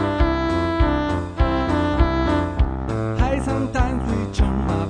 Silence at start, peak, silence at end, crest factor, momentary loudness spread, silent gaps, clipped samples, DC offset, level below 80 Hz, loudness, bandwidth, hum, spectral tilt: 0 s; -4 dBFS; 0 s; 16 dB; 4 LU; none; under 0.1%; under 0.1%; -24 dBFS; -21 LUFS; 9.8 kHz; none; -7.5 dB/octave